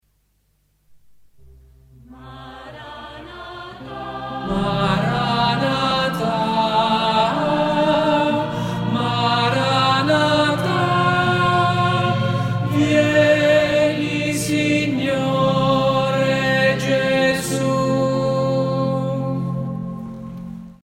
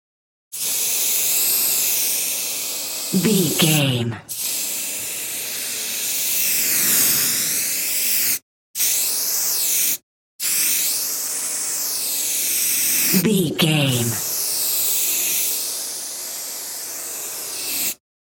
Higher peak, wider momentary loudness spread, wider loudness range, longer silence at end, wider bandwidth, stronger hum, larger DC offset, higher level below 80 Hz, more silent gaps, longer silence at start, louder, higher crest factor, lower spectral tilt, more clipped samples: about the same, -4 dBFS vs -2 dBFS; first, 17 LU vs 10 LU; first, 7 LU vs 3 LU; second, 0.1 s vs 0.25 s; about the same, 16 kHz vs 17 kHz; neither; neither; first, -46 dBFS vs -64 dBFS; second, none vs 8.42-8.74 s, 10.03-10.39 s; first, 2.1 s vs 0.5 s; about the same, -18 LUFS vs -18 LUFS; about the same, 16 dB vs 18 dB; first, -5.5 dB/octave vs -2 dB/octave; neither